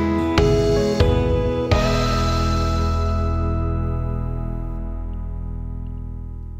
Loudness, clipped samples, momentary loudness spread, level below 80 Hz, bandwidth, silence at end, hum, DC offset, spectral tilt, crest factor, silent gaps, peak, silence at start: -21 LUFS; under 0.1%; 13 LU; -26 dBFS; 15 kHz; 0 s; none; 0.5%; -6.5 dB/octave; 18 dB; none; -2 dBFS; 0 s